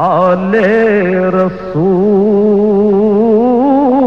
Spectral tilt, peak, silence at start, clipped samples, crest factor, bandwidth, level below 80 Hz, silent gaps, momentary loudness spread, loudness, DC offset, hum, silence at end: -9.5 dB/octave; -2 dBFS; 0 s; under 0.1%; 8 dB; 6.2 kHz; -46 dBFS; none; 3 LU; -10 LUFS; 0.9%; none; 0 s